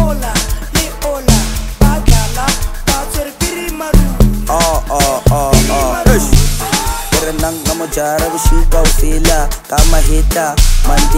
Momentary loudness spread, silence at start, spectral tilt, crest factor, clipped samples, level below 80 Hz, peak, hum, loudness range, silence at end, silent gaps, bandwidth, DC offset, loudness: 6 LU; 0 s; -4 dB/octave; 10 dB; 0.1%; -12 dBFS; 0 dBFS; none; 2 LU; 0 s; none; 16.5 kHz; under 0.1%; -13 LUFS